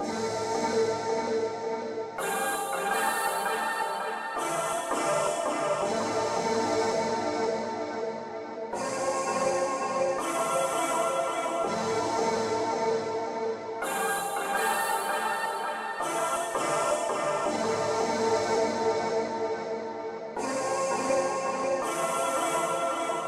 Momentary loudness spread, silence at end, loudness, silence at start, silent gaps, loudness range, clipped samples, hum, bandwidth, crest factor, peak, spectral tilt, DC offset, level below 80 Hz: 6 LU; 0 s; -29 LUFS; 0 s; none; 2 LU; under 0.1%; none; 16 kHz; 14 dB; -14 dBFS; -3 dB/octave; under 0.1%; -66 dBFS